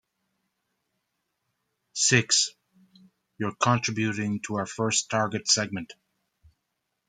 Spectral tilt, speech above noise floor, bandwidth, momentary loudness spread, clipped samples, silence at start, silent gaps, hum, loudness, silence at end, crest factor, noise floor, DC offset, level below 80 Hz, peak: -3 dB/octave; 54 dB; 10 kHz; 13 LU; under 0.1%; 1.95 s; none; none; -25 LUFS; 1.15 s; 24 dB; -80 dBFS; under 0.1%; -68 dBFS; -6 dBFS